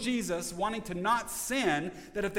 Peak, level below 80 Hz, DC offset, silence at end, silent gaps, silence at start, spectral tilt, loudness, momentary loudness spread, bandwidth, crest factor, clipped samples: -16 dBFS; -54 dBFS; under 0.1%; 0 s; none; 0 s; -3.5 dB/octave; -32 LUFS; 5 LU; 17 kHz; 16 dB; under 0.1%